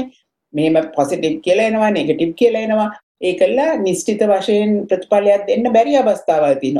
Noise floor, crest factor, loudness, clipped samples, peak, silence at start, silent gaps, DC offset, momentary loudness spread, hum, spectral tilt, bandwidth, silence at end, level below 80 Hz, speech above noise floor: -42 dBFS; 14 dB; -16 LUFS; under 0.1%; -2 dBFS; 0 s; 3.03-3.15 s; under 0.1%; 5 LU; none; -5.5 dB/octave; 12.5 kHz; 0 s; -58 dBFS; 27 dB